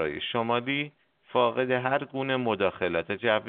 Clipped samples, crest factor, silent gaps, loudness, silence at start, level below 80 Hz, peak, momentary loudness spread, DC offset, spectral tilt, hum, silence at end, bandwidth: under 0.1%; 20 dB; none; -28 LUFS; 0 s; -64 dBFS; -8 dBFS; 5 LU; under 0.1%; -3 dB/octave; none; 0 s; 4.5 kHz